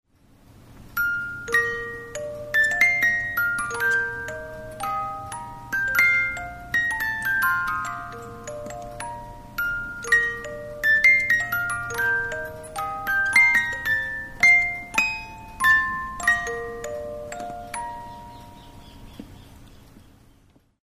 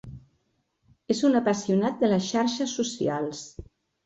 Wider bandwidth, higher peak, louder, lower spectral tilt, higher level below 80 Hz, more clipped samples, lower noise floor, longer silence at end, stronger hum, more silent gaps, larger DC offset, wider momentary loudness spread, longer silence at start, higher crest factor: first, 15.5 kHz vs 8.2 kHz; first, -6 dBFS vs -10 dBFS; first, -21 LUFS vs -25 LUFS; second, -2.5 dB/octave vs -5 dB/octave; first, -48 dBFS vs -58 dBFS; neither; second, -58 dBFS vs -73 dBFS; first, 0.85 s vs 0.4 s; neither; neither; neither; first, 19 LU vs 13 LU; first, 0.6 s vs 0.05 s; about the same, 20 dB vs 16 dB